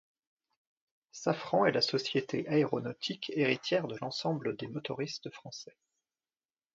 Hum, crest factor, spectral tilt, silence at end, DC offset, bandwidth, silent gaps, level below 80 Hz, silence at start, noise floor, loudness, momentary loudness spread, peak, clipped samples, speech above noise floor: none; 22 dB; -5 dB/octave; 1.1 s; under 0.1%; 7.8 kHz; none; -76 dBFS; 1.15 s; under -90 dBFS; -33 LUFS; 16 LU; -12 dBFS; under 0.1%; over 57 dB